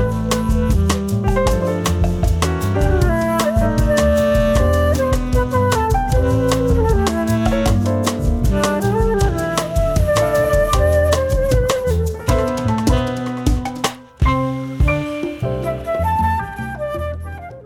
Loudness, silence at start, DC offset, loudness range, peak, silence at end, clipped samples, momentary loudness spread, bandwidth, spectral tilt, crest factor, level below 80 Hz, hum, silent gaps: -18 LUFS; 0 s; under 0.1%; 4 LU; -6 dBFS; 0 s; under 0.1%; 7 LU; 18 kHz; -6 dB/octave; 10 dB; -22 dBFS; none; none